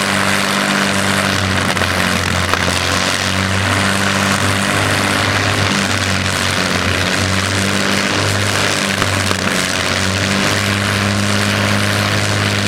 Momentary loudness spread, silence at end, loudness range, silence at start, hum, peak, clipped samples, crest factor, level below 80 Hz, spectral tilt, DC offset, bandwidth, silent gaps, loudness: 1 LU; 0 s; 1 LU; 0 s; none; 0 dBFS; under 0.1%; 16 dB; -40 dBFS; -3.5 dB/octave; under 0.1%; 16.5 kHz; none; -14 LUFS